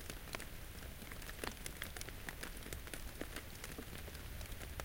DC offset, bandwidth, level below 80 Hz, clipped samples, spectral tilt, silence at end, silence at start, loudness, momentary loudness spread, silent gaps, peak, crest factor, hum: under 0.1%; 17 kHz; -52 dBFS; under 0.1%; -3.5 dB/octave; 0 s; 0 s; -48 LUFS; 4 LU; none; -22 dBFS; 26 dB; none